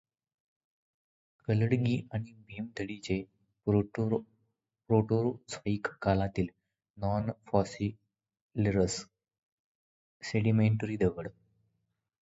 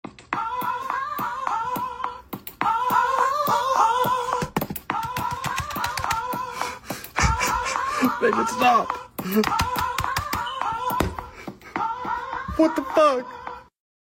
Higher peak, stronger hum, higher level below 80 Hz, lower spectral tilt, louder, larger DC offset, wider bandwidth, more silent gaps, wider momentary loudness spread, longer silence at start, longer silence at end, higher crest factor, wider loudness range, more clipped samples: second, -10 dBFS vs -6 dBFS; neither; second, -54 dBFS vs -42 dBFS; first, -7 dB/octave vs -4 dB/octave; second, -32 LUFS vs -24 LUFS; neither; second, 8 kHz vs 17 kHz; first, 6.90-6.94 s, 8.41-8.49 s, 9.43-10.20 s vs none; about the same, 13 LU vs 11 LU; first, 1.5 s vs 0.05 s; first, 0.95 s vs 0.5 s; about the same, 22 dB vs 18 dB; about the same, 3 LU vs 3 LU; neither